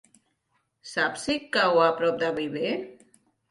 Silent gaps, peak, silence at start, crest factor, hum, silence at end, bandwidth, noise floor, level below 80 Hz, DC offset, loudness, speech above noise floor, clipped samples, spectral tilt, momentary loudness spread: none; -8 dBFS; 0.85 s; 20 dB; none; 0.55 s; 11.5 kHz; -74 dBFS; -66 dBFS; under 0.1%; -25 LUFS; 49 dB; under 0.1%; -4 dB/octave; 12 LU